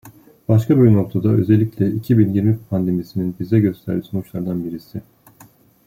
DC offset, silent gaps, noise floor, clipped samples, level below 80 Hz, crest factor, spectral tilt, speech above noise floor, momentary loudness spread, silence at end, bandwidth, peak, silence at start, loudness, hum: under 0.1%; none; -49 dBFS; under 0.1%; -52 dBFS; 16 dB; -10 dB/octave; 32 dB; 13 LU; 0.85 s; 15.5 kHz; -2 dBFS; 0.05 s; -18 LUFS; none